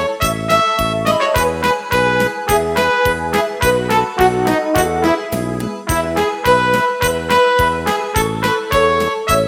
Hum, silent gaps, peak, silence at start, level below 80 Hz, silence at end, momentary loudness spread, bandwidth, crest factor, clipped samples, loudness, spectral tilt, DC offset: none; none; 0 dBFS; 0 s; -34 dBFS; 0 s; 5 LU; 17 kHz; 16 dB; under 0.1%; -16 LUFS; -4.5 dB/octave; under 0.1%